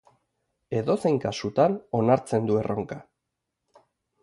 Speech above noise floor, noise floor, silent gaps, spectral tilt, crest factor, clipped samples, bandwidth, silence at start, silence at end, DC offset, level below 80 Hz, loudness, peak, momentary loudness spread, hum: 58 dB; -82 dBFS; none; -7 dB/octave; 20 dB; under 0.1%; 11.5 kHz; 0.7 s; 1.2 s; under 0.1%; -60 dBFS; -25 LUFS; -8 dBFS; 9 LU; none